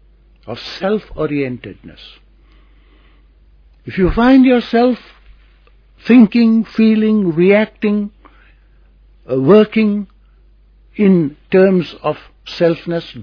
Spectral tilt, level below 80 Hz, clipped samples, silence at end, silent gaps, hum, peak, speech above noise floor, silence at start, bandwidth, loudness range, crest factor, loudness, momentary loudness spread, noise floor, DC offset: -9 dB/octave; -38 dBFS; under 0.1%; 0 s; none; none; 0 dBFS; 34 dB; 0.45 s; 5.4 kHz; 11 LU; 16 dB; -13 LUFS; 18 LU; -47 dBFS; under 0.1%